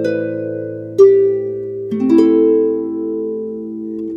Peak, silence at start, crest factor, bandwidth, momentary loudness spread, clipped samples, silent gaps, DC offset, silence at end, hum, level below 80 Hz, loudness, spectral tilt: 0 dBFS; 0 s; 14 dB; 7.2 kHz; 15 LU; under 0.1%; none; under 0.1%; 0 s; none; -62 dBFS; -15 LUFS; -8.5 dB/octave